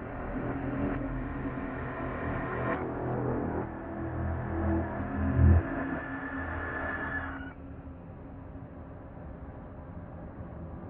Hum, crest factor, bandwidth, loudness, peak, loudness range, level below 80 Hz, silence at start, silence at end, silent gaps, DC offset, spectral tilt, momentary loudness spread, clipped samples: none; 22 dB; 3.6 kHz; -33 LUFS; -12 dBFS; 11 LU; -44 dBFS; 0 s; 0 s; none; under 0.1%; -12 dB/octave; 15 LU; under 0.1%